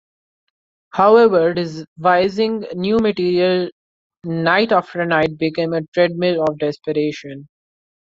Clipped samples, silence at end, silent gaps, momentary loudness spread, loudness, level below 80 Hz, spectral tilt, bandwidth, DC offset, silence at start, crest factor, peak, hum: under 0.1%; 0.55 s; 1.88-1.96 s, 3.72-4.10 s, 5.88-5.92 s; 14 LU; -17 LUFS; -56 dBFS; -7 dB/octave; 7.6 kHz; under 0.1%; 0.95 s; 16 dB; -2 dBFS; none